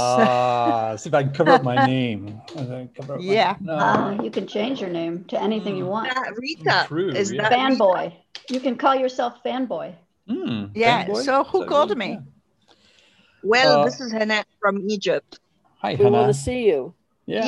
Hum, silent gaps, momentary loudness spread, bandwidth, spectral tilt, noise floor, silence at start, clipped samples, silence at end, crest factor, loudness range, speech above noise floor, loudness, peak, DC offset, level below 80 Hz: none; none; 14 LU; 12 kHz; -5 dB/octave; -59 dBFS; 0 s; under 0.1%; 0 s; 20 dB; 3 LU; 38 dB; -21 LUFS; 0 dBFS; under 0.1%; -54 dBFS